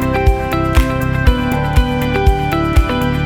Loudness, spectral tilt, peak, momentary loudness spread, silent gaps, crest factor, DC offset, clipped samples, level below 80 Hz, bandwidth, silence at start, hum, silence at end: -15 LUFS; -6.5 dB/octave; 0 dBFS; 2 LU; none; 14 dB; under 0.1%; under 0.1%; -16 dBFS; 18.5 kHz; 0 s; none; 0 s